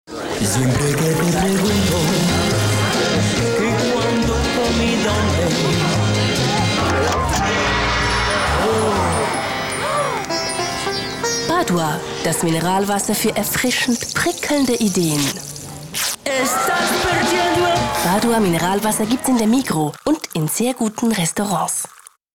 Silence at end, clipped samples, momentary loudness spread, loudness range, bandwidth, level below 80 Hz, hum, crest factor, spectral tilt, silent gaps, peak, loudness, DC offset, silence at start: 0.45 s; under 0.1%; 4 LU; 2 LU; 19.5 kHz; -36 dBFS; none; 10 dB; -4 dB/octave; none; -8 dBFS; -18 LUFS; under 0.1%; 0.1 s